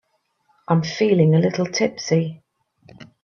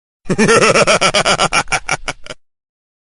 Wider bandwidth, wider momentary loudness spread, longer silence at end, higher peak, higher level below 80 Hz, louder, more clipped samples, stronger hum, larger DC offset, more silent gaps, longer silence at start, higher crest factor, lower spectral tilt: second, 7 kHz vs 11.5 kHz; second, 6 LU vs 12 LU; second, 0.2 s vs 0.75 s; second, -4 dBFS vs 0 dBFS; second, -62 dBFS vs -38 dBFS; second, -20 LUFS vs -12 LUFS; neither; neither; neither; neither; first, 0.7 s vs 0.25 s; about the same, 18 dB vs 14 dB; first, -6.5 dB/octave vs -3 dB/octave